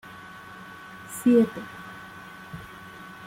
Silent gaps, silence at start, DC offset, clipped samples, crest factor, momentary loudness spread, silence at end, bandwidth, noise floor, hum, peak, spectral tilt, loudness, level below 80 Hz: none; 0.95 s; under 0.1%; under 0.1%; 20 dB; 22 LU; 0 s; 16 kHz; -44 dBFS; none; -10 dBFS; -6 dB/octave; -24 LUFS; -62 dBFS